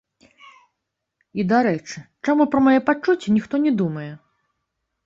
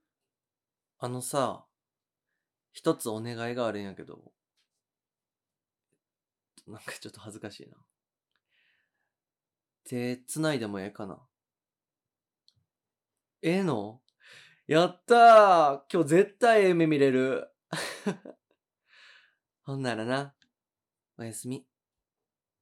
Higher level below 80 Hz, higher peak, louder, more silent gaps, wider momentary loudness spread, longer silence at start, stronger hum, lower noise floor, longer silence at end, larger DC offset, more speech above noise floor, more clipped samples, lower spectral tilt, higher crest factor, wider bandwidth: first, -60 dBFS vs -90 dBFS; about the same, -4 dBFS vs -6 dBFS; first, -20 LUFS vs -25 LUFS; neither; second, 16 LU vs 22 LU; first, 1.35 s vs 1 s; neither; second, -79 dBFS vs under -90 dBFS; about the same, 0.9 s vs 1 s; neither; second, 60 dB vs over 64 dB; neither; first, -7 dB/octave vs -5.5 dB/octave; about the same, 18 dB vs 22 dB; second, 7.6 kHz vs 15 kHz